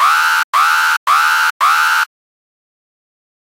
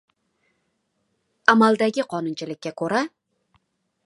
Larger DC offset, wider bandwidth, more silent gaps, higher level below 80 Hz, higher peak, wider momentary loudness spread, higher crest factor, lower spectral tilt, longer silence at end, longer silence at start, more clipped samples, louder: neither; first, 16 kHz vs 11.5 kHz; first, 0.44-0.53 s, 0.97-1.06 s, 1.50-1.60 s vs none; second, -82 dBFS vs -76 dBFS; about the same, -2 dBFS vs 0 dBFS; second, 3 LU vs 15 LU; second, 14 dB vs 24 dB; second, 6 dB/octave vs -5 dB/octave; first, 1.35 s vs 1 s; second, 0 s vs 1.5 s; neither; first, -12 LUFS vs -22 LUFS